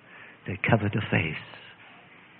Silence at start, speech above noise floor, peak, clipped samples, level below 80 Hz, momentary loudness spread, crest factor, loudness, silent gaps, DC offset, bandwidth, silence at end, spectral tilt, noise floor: 0.1 s; 25 dB; -8 dBFS; under 0.1%; -60 dBFS; 22 LU; 22 dB; -27 LUFS; none; under 0.1%; 4.3 kHz; 0.4 s; -10.5 dB/octave; -52 dBFS